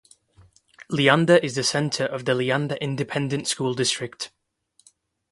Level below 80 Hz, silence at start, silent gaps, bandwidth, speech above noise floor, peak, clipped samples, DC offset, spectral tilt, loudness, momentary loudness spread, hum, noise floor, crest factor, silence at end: -64 dBFS; 0.8 s; none; 11.5 kHz; 43 dB; -2 dBFS; under 0.1%; under 0.1%; -4 dB/octave; -22 LUFS; 11 LU; none; -65 dBFS; 22 dB; 1.05 s